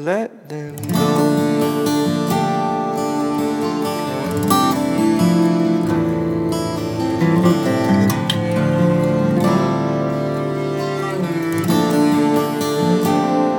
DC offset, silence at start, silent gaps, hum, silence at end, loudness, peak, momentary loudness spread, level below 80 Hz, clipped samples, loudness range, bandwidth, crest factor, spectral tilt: under 0.1%; 0 s; none; none; 0 s; -18 LUFS; -2 dBFS; 6 LU; -50 dBFS; under 0.1%; 2 LU; 18 kHz; 14 dB; -6.5 dB/octave